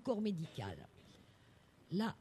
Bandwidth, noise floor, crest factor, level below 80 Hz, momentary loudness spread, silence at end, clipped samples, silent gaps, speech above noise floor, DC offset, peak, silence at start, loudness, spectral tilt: 13 kHz; -66 dBFS; 18 dB; -72 dBFS; 24 LU; 0.05 s; under 0.1%; none; 26 dB; under 0.1%; -24 dBFS; 0 s; -42 LUFS; -7 dB/octave